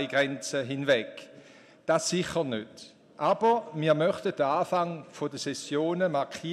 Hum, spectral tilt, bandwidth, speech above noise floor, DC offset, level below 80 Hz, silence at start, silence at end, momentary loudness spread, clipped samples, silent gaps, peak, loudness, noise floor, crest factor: none; -4.5 dB/octave; 14 kHz; 25 dB; under 0.1%; -70 dBFS; 0 s; 0 s; 11 LU; under 0.1%; none; -12 dBFS; -28 LUFS; -53 dBFS; 18 dB